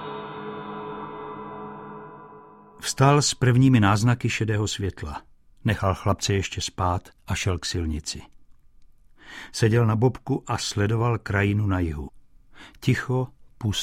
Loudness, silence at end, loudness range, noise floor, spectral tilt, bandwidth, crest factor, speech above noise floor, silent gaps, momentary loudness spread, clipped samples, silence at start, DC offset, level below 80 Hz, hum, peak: -24 LUFS; 0 s; 6 LU; -51 dBFS; -5.5 dB/octave; 14.5 kHz; 18 dB; 28 dB; none; 18 LU; under 0.1%; 0 s; under 0.1%; -44 dBFS; none; -6 dBFS